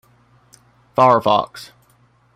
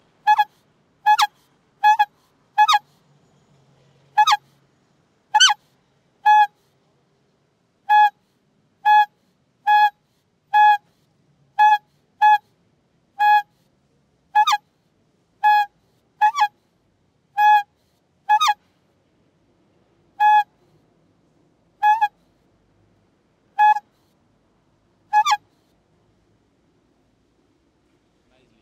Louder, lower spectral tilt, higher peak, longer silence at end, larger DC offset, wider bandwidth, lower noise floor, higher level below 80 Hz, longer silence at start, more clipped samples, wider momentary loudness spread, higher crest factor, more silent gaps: about the same, -16 LUFS vs -18 LUFS; first, -6 dB/octave vs 3 dB/octave; about the same, 0 dBFS vs -2 dBFS; second, 0.7 s vs 3.25 s; neither; about the same, 15.5 kHz vs 16 kHz; second, -56 dBFS vs -66 dBFS; first, -60 dBFS vs -76 dBFS; first, 1 s vs 0.25 s; neither; first, 19 LU vs 9 LU; about the same, 20 dB vs 20 dB; neither